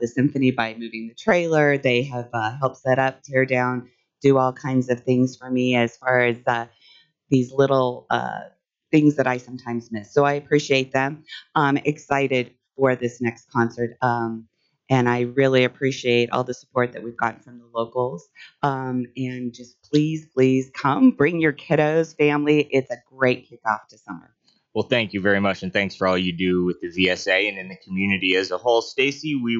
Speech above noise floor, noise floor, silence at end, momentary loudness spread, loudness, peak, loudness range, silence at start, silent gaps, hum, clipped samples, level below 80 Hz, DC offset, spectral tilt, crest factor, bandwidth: 34 dB; -55 dBFS; 0 s; 11 LU; -22 LUFS; -6 dBFS; 4 LU; 0 s; none; none; under 0.1%; -64 dBFS; under 0.1%; -6 dB/octave; 16 dB; 7.6 kHz